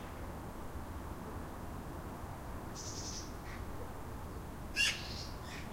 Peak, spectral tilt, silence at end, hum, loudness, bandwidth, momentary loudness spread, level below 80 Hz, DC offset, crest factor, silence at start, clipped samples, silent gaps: -20 dBFS; -3 dB/octave; 0 s; none; -42 LUFS; 16 kHz; 14 LU; -50 dBFS; under 0.1%; 22 dB; 0 s; under 0.1%; none